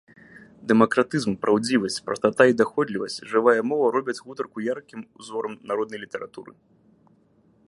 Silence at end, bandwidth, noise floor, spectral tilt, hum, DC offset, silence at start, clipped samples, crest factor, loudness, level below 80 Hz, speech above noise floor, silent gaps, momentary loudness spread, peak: 1.2 s; 11.5 kHz; -60 dBFS; -5 dB/octave; none; under 0.1%; 0.35 s; under 0.1%; 22 dB; -23 LUFS; -66 dBFS; 37 dB; none; 16 LU; -2 dBFS